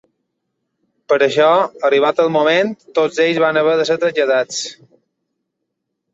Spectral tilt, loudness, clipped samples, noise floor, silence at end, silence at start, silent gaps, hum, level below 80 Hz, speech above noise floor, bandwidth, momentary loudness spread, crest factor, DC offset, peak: -4 dB/octave; -15 LUFS; under 0.1%; -75 dBFS; 1.4 s; 1.1 s; none; none; -68 dBFS; 61 dB; 8 kHz; 6 LU; 16 dB; under 0.1%; -2 dBFS